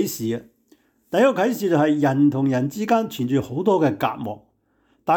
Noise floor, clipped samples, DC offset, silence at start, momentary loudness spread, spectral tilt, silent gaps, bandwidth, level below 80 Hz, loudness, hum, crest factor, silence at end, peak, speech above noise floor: -64 dBFS; under 0.1%; under 0.1%; 0 s; 13 LU; -6.5 dB/octave; none; 19.5 kHz; -64 dBFS; -21 LUFS; none; 14 dB; 0 s; -8 dBFS; 44 dB